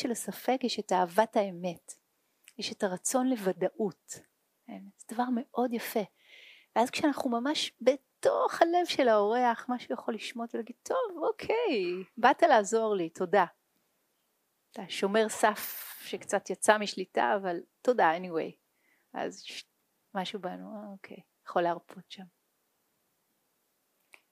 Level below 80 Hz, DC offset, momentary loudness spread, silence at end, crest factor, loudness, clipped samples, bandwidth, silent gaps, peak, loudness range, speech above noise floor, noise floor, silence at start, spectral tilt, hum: -82 dBFS; under 0.1%; 18 LU; 2.05 s; 26 dB; -30 LUFS; under 0.1%; 15.5 kHz; none; -6 dBFS; 10 LU; 47 dB; -77 dBFS; 0 s; -3.5 dB/octave; none